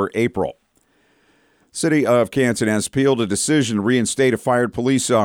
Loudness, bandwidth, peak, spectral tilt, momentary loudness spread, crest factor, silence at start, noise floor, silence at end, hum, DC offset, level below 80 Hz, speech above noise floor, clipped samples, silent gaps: -18 LUFS; 17.5 kHz; -6 dBFS; -4.5 dB/octave; 5 LU; 14 dB; 0 s; -61 dBFS; 0 s; none; under 0.1%; -54 dBFS; 43 dB; under 0.1%; none